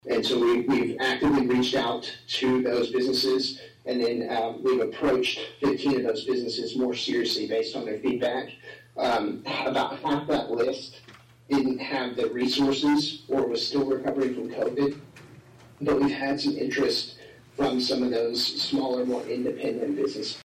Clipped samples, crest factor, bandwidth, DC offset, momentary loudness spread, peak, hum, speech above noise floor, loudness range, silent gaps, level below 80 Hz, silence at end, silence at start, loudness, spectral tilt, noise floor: under 0.1%; 10 dB; 15 kHz; under 0.1%; 6 LU; -16 dBFS; none; 24 dB; 3 LU; none; -58 dBFS; 0 s; 0.05 s; -26 LUFS; -4.5 dB/octave; -50 dBFS